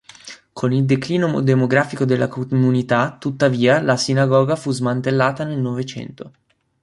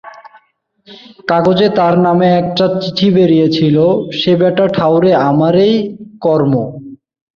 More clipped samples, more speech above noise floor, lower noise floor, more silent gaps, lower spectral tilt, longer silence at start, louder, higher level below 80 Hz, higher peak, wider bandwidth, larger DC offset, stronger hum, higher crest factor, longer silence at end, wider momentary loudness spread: neither; second, 23 dB vs 41 dB; second, -41 dBFS vs -52 dBFS; neither; second, -6.5 dB/octave vs -8 dB/octave; first, 0.25 s vs 0.05 s; second, -18 LUFS vs -11 LUFS; second, -58 dBFS vs -50 dBFS; about the same, -2 dBFS vs 0 dBFS; first, 11.5 kHz vs 6.8 kHz; neither; neither; about the same, 16 dB vs 12 dB; about the same, 0.55 s vs 0.45 s; first, 13 LU vs 7 LU